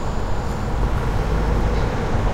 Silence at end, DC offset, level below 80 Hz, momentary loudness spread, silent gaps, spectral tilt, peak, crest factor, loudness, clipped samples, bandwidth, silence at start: 0 s; under 0.1%; -22 dBFS; 4 LU; none; -7 dB/octave; -8 dBFS; 12 dB; -23 LUFS; under 0.1%; 12 kHz; 0 s